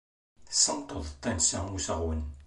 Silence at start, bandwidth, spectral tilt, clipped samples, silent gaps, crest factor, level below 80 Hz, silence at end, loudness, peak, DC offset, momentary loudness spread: 0.4 s; 11.5 kHz; -2.5 dB/octave; under 0.1%; none; 22 dB; -42 dBFS; 0 s; -28 LUFS; -8 dBFS; under 0.1%; 11 LU